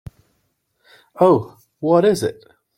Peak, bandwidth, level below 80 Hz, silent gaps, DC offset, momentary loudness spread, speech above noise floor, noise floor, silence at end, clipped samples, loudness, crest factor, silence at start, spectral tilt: -2 dBFS; 16.5 kHz; -56 dBFS; none; under 0.1%; 11 LU; 52 dB; -68 dBFS; 0.45 s; under 0.1%; -17 LUFS; 18 dB; 1.15 s; -6.5 dB/octave